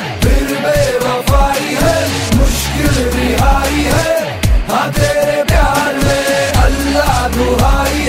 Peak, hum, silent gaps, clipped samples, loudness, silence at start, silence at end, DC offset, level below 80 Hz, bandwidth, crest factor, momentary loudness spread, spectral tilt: 0 dBFS; none; none; under 0.1%; -13 LUFS; 0 s; 0 s; under 0.1%; -18 dBFS; 16.5 kHz; 12 dB; 2 LU; -4.5 dB/octave